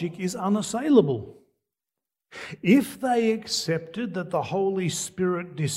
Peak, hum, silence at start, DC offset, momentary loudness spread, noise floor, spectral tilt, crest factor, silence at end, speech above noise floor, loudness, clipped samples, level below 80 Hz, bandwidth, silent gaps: -4 dBFS; none; 0 s; under 0.1%; 12 LU; -88 dBFS; -5 dB/octave; 20 dB; 0 s; 64 dB; -25 LUFS; under 0.1%; -66 dBFS; 16 kHz; none